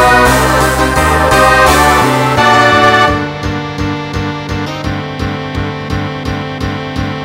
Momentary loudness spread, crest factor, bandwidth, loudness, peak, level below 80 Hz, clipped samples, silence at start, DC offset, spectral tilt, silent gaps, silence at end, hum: 12 LU; 10 dB; 16.5 kHz; -11 LUFS; 0 dBFS; -24 dBFS; 0.3%; 0 s; under 0.1%; -4.5 dB/octave; none; 0 s; none